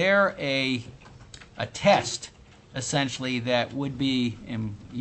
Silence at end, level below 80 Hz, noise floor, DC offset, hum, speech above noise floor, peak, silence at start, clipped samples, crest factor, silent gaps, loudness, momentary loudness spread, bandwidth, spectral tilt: 0 s; -56 dBFS; -47 dBFS; under 0.1%; none; 21 dB; -8 dBFS; 0 s; under 0.1%; 20 dB; none; -26 LUFS; 20 LU; 8.6 kHz; -4.5 dB/octave